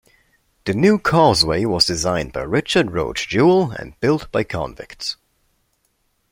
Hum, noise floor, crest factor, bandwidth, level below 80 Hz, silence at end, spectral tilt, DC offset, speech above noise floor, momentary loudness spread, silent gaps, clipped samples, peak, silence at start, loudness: none; -66 dBFS; 18 dB; 16.5 kHz; -44 dBFS; 1.15 s; -5 dB/octave; under 0.1%; 48 dB; 13 LU; none; under 0.1%; 0 dBFS; 0.65 s; -18 LUFS